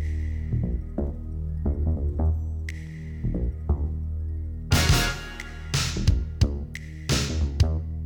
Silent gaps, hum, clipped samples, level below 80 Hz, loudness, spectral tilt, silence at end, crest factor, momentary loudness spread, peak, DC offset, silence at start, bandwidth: none; none; under 0.1%; -28 dBFS; -27 LUFS; -5 dB/octave; 0 s; 18 dB; 11 LU; -8 dBFS; under 0.1%; 0 s; 19 kHz